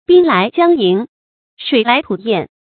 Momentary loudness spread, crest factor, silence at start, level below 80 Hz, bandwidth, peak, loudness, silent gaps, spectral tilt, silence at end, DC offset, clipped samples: 9 LU; 14 dB; 0.1 s; -58 dBFS; 4.6 kHz; 0 dBFS; -13 LUFS; 1.09-1.57 s; -10 dB/octave; 0.2 s; under 0.1%; under 0.1%